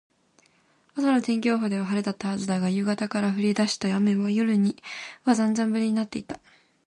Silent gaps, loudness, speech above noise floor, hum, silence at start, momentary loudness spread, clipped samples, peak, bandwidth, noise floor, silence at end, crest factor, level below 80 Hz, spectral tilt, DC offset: none; -25 LUFS; 39 dB; none; 0.95 s; 11 LU; under 0.1%; -8 dBFS; 10.5 kHz; -63 dBFS; 0.5 s; 18 dB; -68 dBFS; -5.5 dB/octave; under 0.1%